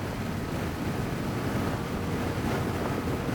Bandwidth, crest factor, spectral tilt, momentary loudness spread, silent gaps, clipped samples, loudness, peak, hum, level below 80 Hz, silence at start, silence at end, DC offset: over 20 kHz; 14 dB; -6 dB/octave; 3 LU; none; under 0.1%; -31 LUFS; -16 dBFS; none; -44 dBFS; 0 s; 0 s; under 0.1%